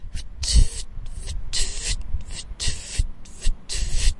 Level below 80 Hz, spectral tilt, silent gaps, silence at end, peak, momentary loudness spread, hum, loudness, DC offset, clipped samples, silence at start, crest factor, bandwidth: -24 dBFS; -2.5 dB/octave; none; 0 s; -4 dBFS; 14 LU; none; -27 LUFS; under 0.1%; under 0.1%; 0 s; 18 dB; 11.5 kHz